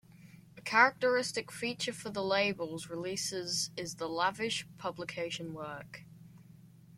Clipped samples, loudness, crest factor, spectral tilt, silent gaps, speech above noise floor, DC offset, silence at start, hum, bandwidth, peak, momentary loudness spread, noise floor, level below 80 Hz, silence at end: under 0.1%; -33 LUFS; 26 dB; -2.5 dB/octave; none; 23 dB; under 0.1%; 0.15 s; none; 16.5 kHz; -10 dBFS; 16 LU; -57 dBFS; -74 dBFS; 0 s